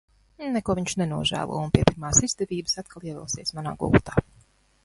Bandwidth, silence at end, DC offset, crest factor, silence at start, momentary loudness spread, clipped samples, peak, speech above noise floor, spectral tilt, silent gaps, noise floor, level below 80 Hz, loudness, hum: 11.5 kHz; 0.65 s; under 0.1%; 26 dB; 0.4 s; 10 LU; under 0.1%; 0 dBFS; 34 dB; -4 dB/octave; none; -59 dBFS; -42 dBFS; -25 LUFS; none